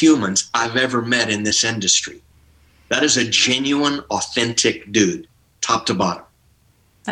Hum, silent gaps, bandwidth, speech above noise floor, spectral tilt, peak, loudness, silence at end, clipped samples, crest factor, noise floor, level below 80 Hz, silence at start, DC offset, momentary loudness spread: none; none; 11.5 kHz; 39 dB; -2.5 dB/octave; -2 dBFS; -18 LUFS; 0 s; under 0.1%; 16 dB; -57 dBFS; -56 dBFS; 0 s; under 0.1%; 8 LU